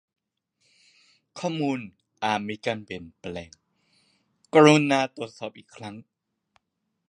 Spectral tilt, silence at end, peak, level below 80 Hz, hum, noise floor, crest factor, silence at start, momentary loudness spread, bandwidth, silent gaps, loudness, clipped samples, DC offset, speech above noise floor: -5.5 dB/octave; 1.05 s; -2 dBFS; -64 dBFS; none; -79 dBFS; 26 dB; 1.35 s; 24 LU; 10.5 kHz; none; -23 LUFS; under 0.1%; under 0.1%; 55 dB